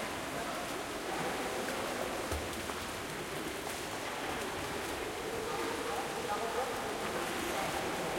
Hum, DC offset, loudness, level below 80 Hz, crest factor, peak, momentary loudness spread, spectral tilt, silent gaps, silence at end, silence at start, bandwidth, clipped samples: none; under 0.1%; -37 LUFS; -56 dBFS; 16 dB; -22 dBFS; 3 LU; -3 dB/octave; none; 0 s; 0 s; 16.5 kHz; under 0.1%